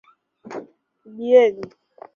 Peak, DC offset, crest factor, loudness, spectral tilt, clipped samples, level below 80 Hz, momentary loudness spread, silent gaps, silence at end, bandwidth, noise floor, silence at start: -2 dBFS; under 0.1%; 20 dB; -17 LUFS; -5.5 dB/octave; under 0.1%; -70 dBFS; 21 LU; none; 0.5 s; 6.8 kHz; -49 dBFS; 0.5 s